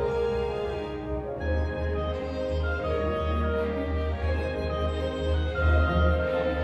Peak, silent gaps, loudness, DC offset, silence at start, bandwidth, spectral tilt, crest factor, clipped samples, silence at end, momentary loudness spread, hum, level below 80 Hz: -12 dBFS; none; -28 LUFS; under 0.1%; 0 s; 6.2 kHz; -8 dB/octave; 14 dB; under 0.1%; 0 s; 7 LU; none; -32 dBFS